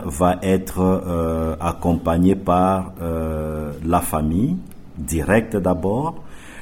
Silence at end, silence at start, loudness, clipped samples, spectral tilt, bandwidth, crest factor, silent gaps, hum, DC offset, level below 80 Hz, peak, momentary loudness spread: 0 s; 0 s; -20 LUFS; under 0.1%; -7 dB/octave; 16.5 kHz; 16 dB; none; none; under 0.1%; -38 dBFS; -4 dBFS; 9 LU